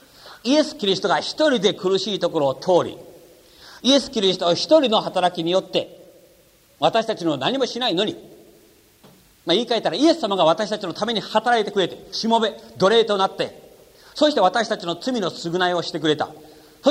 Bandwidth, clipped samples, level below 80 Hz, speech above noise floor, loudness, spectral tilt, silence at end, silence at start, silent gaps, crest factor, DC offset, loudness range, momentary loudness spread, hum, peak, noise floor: 16 kHz; under 0.1%; -62 dBFS; 34 dB; -20 LUFS; -4 dB/octave; 0 s; 0.25 s; none; 20 dB; under 0.1%; 3 LU; 8 LU; none; -2 dBFS; -55 dBFS